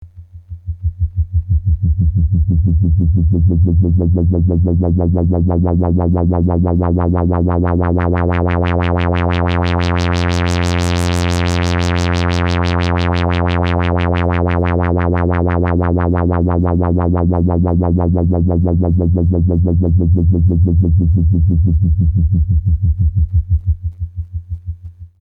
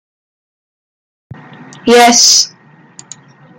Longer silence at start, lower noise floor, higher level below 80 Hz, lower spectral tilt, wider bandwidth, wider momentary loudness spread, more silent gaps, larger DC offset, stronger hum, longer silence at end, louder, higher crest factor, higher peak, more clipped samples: second, 0 s vs 1.85 s; second, -35 dBFS vs -39 dBFS; first, -26 dBFS vs -56 dBFS; first, -8 dB/octave vs -0.5 dB/octave; second, 9 kHz vs 19.5 kHz; second, 4 LU vs 14 LU; neither; neither; neither; second, 0.15 s vs 1.1 s; second, -15 LUFS vs -7 LUFS; about the same, 10 dB vs 14 dB; second, -4 dBFS vs 0 dBFS; neither